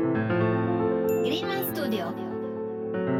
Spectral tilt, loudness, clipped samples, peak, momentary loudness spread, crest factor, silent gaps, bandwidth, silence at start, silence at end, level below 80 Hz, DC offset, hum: -6.5 dB/octave; -27 LUFS; under 0.1%; -12 dBFS; 8 LU; 14 dB; none; 19.5 kHz; 0 s; 0 s; -62 dBFS; under 0.1%; none